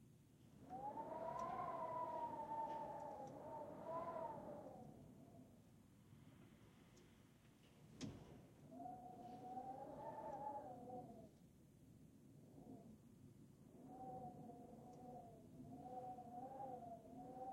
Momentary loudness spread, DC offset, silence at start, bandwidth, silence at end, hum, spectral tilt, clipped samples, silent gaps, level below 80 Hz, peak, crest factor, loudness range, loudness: 19 LU; under 0.1%; 0 s; 16 kHz; 0 s; none; -6.5 dB/octave; under 0.1%; none; -80 dBFS; -36 dBFS; 18 dB; 13 LU; -54 LUFS